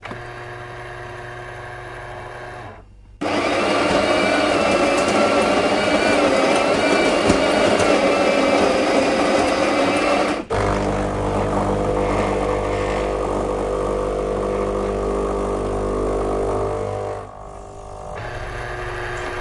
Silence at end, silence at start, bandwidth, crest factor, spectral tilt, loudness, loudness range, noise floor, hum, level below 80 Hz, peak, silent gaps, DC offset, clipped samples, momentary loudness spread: 0 s; 0 s; 11.5 kHz; 18 dB; -4.5 dB/octave; -19 LUFS; 9 LU; -42 dBFS; none; -34 dBFS; -2 dBFS; none; under 0.1%; under 0.1%; 17 LU